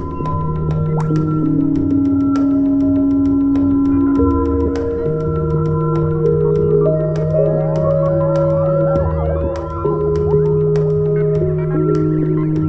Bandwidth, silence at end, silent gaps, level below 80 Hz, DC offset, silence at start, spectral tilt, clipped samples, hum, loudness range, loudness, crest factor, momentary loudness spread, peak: 6.2 kHz; 0 s; none; -30 dBFS; under 0.1%; 0 s; -11 dB/octave; under 0.1%; none; 2 LU; -16 LUFS; 12 dB; 4 LU; -2 dBFS